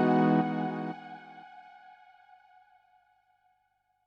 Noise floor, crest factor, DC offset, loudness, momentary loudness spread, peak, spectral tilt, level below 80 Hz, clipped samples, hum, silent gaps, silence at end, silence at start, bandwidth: -75 dBFS; 20 dB; under 0.1%; -29 LUFS; 27 LU; -14 dBFS; -9 dB/octave; -82 dBFS; under 0.1%; 50 Hz at -85 dBFS; none; 2.45 s; 0 s; 6.2 kHz